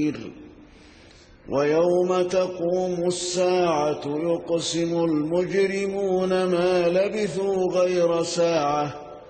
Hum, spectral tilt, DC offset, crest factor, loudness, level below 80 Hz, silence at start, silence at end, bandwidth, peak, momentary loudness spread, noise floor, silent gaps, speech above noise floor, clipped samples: none; -5 dB/octave; under 0.1%; 12 dB; -23 LUFS; -58 dBFS; 0 s; 0 s; 8.8 kHz; -10 dBFS; 5 LU; -50 dBFS; none; 27 dB; under 0.1%